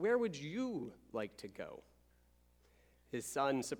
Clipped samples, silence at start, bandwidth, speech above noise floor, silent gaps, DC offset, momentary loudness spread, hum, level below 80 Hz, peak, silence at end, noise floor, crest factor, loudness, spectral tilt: under 0.1%; 0 s; 20 kHz; 31 dB; none; under 0.1%; 14 LU; 60 Hz at -70 dBFS; -72 dBFS; -22 dBFS; 0 s; -70 dBFS; 18 dB; -41 LUFS; -4.5 dB/octave